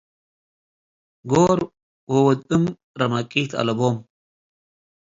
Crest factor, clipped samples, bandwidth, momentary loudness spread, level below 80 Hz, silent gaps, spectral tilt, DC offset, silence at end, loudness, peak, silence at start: 20 dB; under 0.1%; 7.8 kHz; 9 LU; -56 dBFS; 1.83-2.07 s, 2.84-2.94 s; -6.5 dB/octave; under 0.1%; 1.05 s; -21 LUFS; -4 dBFS; 1.25 s